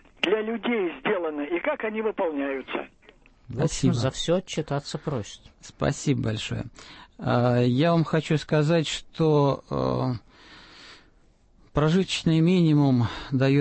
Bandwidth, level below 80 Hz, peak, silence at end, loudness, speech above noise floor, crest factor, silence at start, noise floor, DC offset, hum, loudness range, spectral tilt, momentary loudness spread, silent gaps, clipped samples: 8.8 kHz; -50 dBFS; -10 dBFS; 0 s; -25 LUFS; 34 dB; 16 dB; 0.25 s; -58 dBFS; under 0.1%; none; 5 LU; -6.5 dB/octave; 13 LU; none; under 0.1%